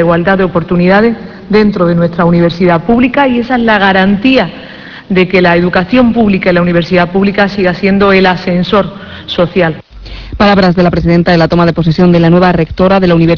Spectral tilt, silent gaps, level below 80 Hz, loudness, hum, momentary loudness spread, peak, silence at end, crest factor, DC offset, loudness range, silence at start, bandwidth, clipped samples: -8.5 dB/octave; none; -30 dBFS; -9 LUFS; none; 7 LU; 0 dBFS; 0 s; 8 dB; under 0.1%; 2 LU; 0 s; 5.4 kHz; 0.6%